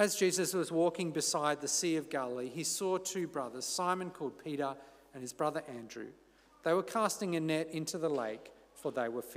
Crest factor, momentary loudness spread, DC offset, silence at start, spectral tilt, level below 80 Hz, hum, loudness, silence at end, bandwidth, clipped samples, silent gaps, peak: 20 dB; 14 LU; under 0.1%; 0 s; -3.5 dB/octave; -76 dBFS; none; -35 LUFS; 0 s; 16 kHz; under 0.1%; none; -14 dBFS